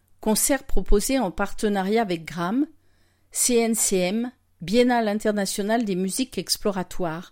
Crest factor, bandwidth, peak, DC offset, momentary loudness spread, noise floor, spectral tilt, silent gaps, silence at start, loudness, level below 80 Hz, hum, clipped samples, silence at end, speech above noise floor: 16 dB; 16.5 kHz; -6 dBFS; under 0.1%; 9 LU; -60 dBFS; -3.5 dB/octave; none; 0.2 s; -23 LUFS; -34 dBFS; none; under 0.1%; 0.05 s; 38 dB